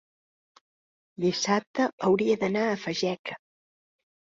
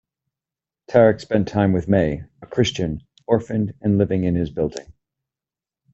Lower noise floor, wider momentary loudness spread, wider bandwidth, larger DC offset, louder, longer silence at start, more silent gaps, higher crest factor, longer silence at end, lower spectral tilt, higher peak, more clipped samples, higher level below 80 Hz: about the same, under -90 dBFS vs -90 dBFS; about the same, 10 LU vs 11 LU; about the same, 7.8 kHz vs 8 kHz; neither; second, -27 LUFS vs -20 LUFS; first, 1.2 s vs 0.9 s; first, 1.67-1.74 s, 1.93-1.98 s, 3.19-3.24 s vs none; about the same, 18 dB vs 18 dB; second, 0.85 s vs 1.05 s; second, -4.5 dB/octave vs -7 dB/octave; second, -12 dBFS vs -2 dBFS; neither; second, -68 dBFS vs -46 dBFS